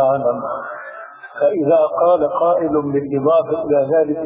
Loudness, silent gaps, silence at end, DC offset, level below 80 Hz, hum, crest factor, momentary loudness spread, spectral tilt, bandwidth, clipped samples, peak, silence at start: -17 LUFS; none; 0 s; under 0.1%; -56 dBFS; none; 12 dB; 15 LU; -11 dB/octave; 3.8 kHz; under 0.1%; -4 dBFS; 0 s